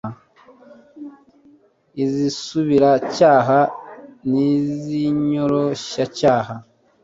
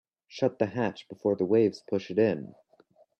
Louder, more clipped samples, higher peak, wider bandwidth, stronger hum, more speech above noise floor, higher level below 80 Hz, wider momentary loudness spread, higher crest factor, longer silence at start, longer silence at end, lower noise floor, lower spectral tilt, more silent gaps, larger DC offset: first, -18 LUFS vs -28 LUFS; neither; first, -2 dBFS vs -10 dBFS; about the same, 7.8 kHz vs 8.4 kHz; neither; about the same, 36 dB vs 35 dB; first, -58 dBFS vs -70 dBFS; first, 22 LU vs 11 LU; about the same, 18 dB vs 18 dB; second, 0.05 s vs 0.3 s; second, 0.4 s vs 0.75 s; second, -53 dBFS vs -63 dBFS; about the same, -6.5 dB/octave vs -7.5 dB/octave; neither; neither